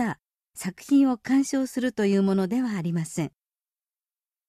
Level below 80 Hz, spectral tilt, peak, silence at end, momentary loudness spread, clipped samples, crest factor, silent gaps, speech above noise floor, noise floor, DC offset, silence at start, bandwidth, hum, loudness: -66 dBFS; -6 dB/octave; -12 dBFS; 1.2 s; 14 LU; under 0.1%; 14 dB; none; over 66 dB; under -90 dBFS; under 0.1%; 0 s; 14 kHz; none; -25 LUFS